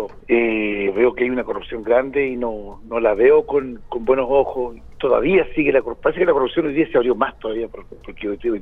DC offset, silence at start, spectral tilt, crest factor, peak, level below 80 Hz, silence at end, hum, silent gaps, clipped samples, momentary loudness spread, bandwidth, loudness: under 0.1%; 0 s; -8.5 dB/octave; 18 dB; -2 dBFS; -42 dBFS; 0 s; none; none; under 0.1%; 12 LU; 3.9 kHz; -19 LUFS